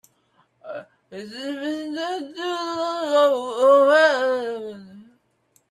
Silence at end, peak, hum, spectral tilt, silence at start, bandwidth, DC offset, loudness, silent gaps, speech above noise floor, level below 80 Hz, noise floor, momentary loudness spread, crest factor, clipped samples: 0.65 s; -4 dBFS; none; -3 dB/octave; 0.65 s; 12.5 kHz; under 0.1%; -20 LUFS; none; 44 dB; -76 dBFS; -65 dBFS; 22 LU; 18 dB; under 0.1%